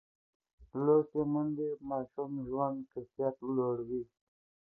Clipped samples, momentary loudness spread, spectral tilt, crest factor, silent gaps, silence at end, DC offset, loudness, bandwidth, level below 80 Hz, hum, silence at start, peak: under 0.1%; 13 LU; -13 dB/octave; 20 dB; none; 0.6 s; under 0.1%; -34 LUFS; 1.9 kHz; -68 dBFS; none; 0.6 s; -16 dBFS